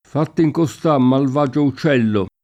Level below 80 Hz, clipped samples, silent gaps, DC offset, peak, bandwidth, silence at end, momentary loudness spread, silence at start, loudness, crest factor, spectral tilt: -56 dBFS; under 0.1%; none; under 0.1%; -4 dBFS; 13 kHz; 0.15 s; 4 LU; 0.15 s; -17 LUFS; 12 dB; -7.5 dB/octave